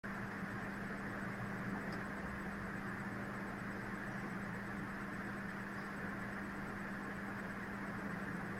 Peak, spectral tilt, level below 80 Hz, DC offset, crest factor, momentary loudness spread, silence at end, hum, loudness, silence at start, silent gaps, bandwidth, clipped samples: -30 dBFS; -6.5 dB/octave; -60 dBFS; under 0.1%; 14 dB; 1 LU; 0 s; none; -44 LUFS; 0.05 s; none; 16 kHz; under 0.1%